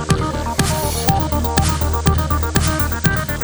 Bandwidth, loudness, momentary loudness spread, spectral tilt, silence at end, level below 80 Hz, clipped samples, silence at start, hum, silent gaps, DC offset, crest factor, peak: over 20 kHz; -18 LUFS; 2 LU; -4.5 dB/octave; 0 s; -24 dBFS; under 0.1%; 0 s; none; none; under 0.1%; 18 dB; 0 dBFS